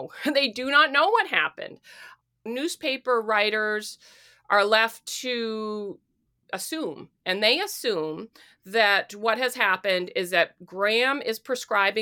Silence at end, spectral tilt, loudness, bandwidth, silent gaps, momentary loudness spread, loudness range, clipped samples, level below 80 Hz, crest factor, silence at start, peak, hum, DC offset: 0 s; -2 dB/octave; -24 LUFS; 19 kHz; none; 13 LU; 4 LU; under 0.1%; -76 dBFS; 20 dB; 0 s; -6 dBFS; none; under 0.1%